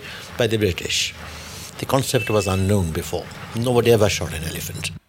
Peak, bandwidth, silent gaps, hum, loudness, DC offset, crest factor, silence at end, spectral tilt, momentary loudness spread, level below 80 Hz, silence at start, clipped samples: -2 dBFS; 17 kHz; none; none; -21 LUFS; under 0.1%; 20 dB; 0.1 s; -4.5 dB/octave; 15 LU; -42 dBFS; 0 s; under 0.1%